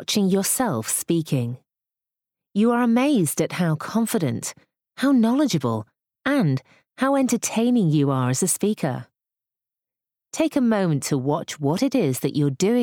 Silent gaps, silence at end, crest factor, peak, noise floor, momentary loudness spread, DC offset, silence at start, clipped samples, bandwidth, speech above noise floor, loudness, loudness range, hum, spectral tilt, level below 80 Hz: none; 0 s; 14 dB; -8 dBFS; -87 dBFS; 9 LU; under 0.1%; 0 s; under 0.1%; 19 kHz; 66 dB; -22 LUFS; 3 LU; none; -5 dB/octave; -66 dBFS